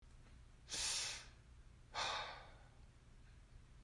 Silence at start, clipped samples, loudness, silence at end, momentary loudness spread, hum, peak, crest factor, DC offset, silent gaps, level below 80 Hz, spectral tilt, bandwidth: 0 s; under 0.1%; -43 LUFS; 0 s; 25 LU; none; -30 dBFS; 20 dB; under 0.1%; none; -64 dBFS; 0 dB/octave; 12 kHz